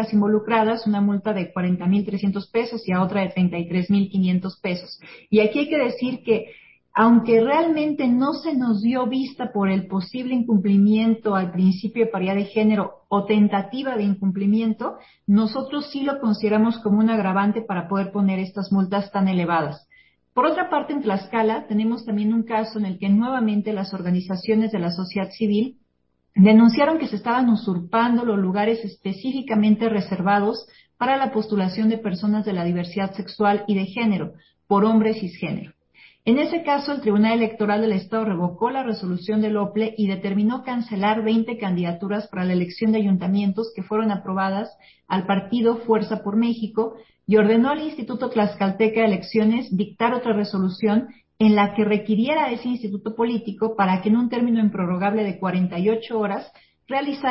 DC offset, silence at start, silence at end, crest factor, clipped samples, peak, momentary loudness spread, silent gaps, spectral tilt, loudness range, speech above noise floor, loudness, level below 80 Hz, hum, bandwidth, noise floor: under 0.1%; 0 s; 0 s; 16 dB; under 0.1%; -4 dBFS; 8 LU; none; -11.5 dB/octave; 3 LU; 49 dB; -21 LUFS; -62 dBFS; none; 5.8 kHz; -70 dBFS